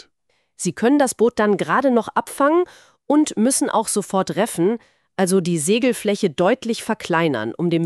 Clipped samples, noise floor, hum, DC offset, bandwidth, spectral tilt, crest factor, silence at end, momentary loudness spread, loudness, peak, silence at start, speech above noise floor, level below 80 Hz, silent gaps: under 0.1%; -68 dBFS; none; under 0.1%; 13.5 kHz; -4.5 dB/octave; 16 dB; 0 s; 7 LU; -19 LUFS; -4 dBFS; 0.6 s; 49 dB; -62 dBFS; none